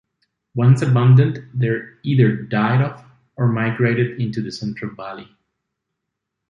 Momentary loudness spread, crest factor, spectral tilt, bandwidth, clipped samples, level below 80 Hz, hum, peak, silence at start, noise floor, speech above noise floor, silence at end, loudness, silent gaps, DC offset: 16 LU; 16 dB; -8.5 dB/octave; 7.4 kHz; under 0.1%; -56 dBFS; none; -2 dBFS; 0.55 s; -79 dBFS; 62 dB; 1.3 s; -18 LUFS; none; under 0.1%